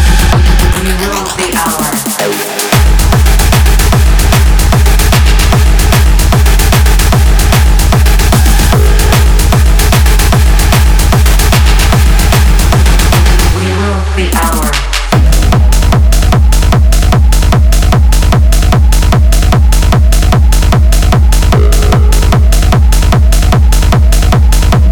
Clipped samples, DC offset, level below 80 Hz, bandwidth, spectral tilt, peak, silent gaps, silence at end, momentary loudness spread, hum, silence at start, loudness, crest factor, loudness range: 0.6%; 2%; -6 dBFS; over 20 kHz; -4.5 dB/octave; 0 dBFS; none; 0 s; 3 LU; none; 0 s; -8 LUFS; 6 dB; 2 LU